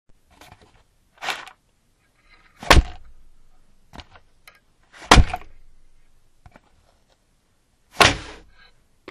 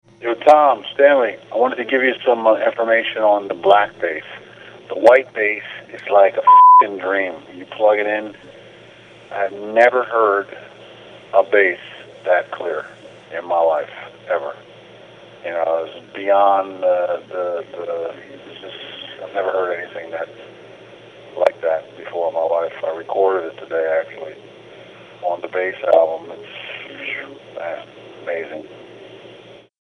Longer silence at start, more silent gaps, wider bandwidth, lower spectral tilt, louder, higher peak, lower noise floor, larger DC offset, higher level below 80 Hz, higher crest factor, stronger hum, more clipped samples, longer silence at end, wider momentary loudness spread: first, 1.25 s vs 0.2 s; neither; first, 13.5 kHz vs 7.2 kHz; second, -3.5 dB/octave vs -5 dB/octave; about the same, -18 LUFS vs -17 LUFS; about the same, 0 dBFS vs 0 dBFS; first, -63 dBFS vs -43 dBFS; neither; first, -28 dBFS vs -68 dBFS; first, 24 dB vs 18 dB; neither; neither; first, 0.85 s vs 0.5 s; first, 29 LU vs 20 LU